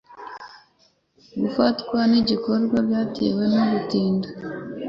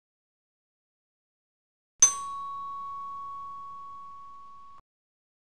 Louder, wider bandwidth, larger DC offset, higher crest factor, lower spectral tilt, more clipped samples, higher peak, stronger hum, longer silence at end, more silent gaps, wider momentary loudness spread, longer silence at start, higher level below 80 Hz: first, -22 LUFS vs -26 LUFS; second, 6.8 kHz vs 14 kHz; second, under 0.1% vs 0.3%; second, 16 dB vs 30 dB; first, -7.5 dB/octave vs 2 dB/octave; neither; about the same, -6 dBFS vs -6 dBFS; neither; second, 0 s vs 0.75 s; neither; second, 17 LU vs 25 LU; second, 0.1 s vs 2 s; first, -56 dBFS vs -68 dBFS